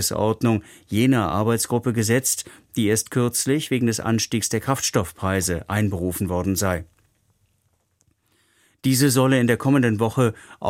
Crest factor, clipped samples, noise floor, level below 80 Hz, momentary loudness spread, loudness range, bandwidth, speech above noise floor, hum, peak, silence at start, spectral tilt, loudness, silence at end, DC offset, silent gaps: 18 dB; under 0.1%; -67 dBFS; -50 dBFS; 6 LU; 5 LU; 16.5 kHz; 46 dB; none; -4 dBFS; 0 s; -5 dB/octave; -21 LUFS; 0 s; under 0.1%; none